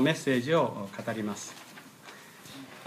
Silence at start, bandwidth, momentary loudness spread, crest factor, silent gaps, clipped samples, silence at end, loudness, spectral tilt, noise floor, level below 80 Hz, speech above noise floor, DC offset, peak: 0 s; 15.5 kHz; 22 LU; 18 dB; none; under 0.1%; 0 s; -30 LUFS; -5 dB/octave; -50 dBFS; -78 dBFS; 21 dB; under 0.1%; -14 dBFS